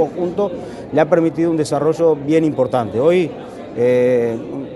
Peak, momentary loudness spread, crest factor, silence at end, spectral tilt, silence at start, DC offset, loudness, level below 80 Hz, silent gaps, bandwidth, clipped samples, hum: 0 dBFS; 9 LU; 16 dB; 0 s; -7 dB/octave; 0 s; under 0.1%; -17 LUFS; -52 dBFS; none; 11.5 kHz; under 0.1%; none